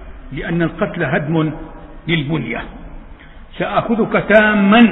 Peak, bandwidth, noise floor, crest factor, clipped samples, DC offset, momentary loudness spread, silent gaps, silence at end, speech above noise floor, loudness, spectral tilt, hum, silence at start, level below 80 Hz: 0 dBFS; 4.1 kHz; -36 dBFS; 16 dB; under 0.1%; under 0.1%; 20 LU; none; 0 s; 22 dB; -16 LUFS; -9 dB/octave; none; 0 s; -36 dBFS